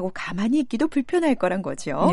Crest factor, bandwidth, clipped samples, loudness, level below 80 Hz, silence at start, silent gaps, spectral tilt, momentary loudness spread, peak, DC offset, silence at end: 14 dB; 11.5 kHz; under 0.1%; -23 LUFS; -52 dBFS; 0 s; none; -6.5 dB/octave; 6 LU; -8 dBFS; under 0.1%; 0 s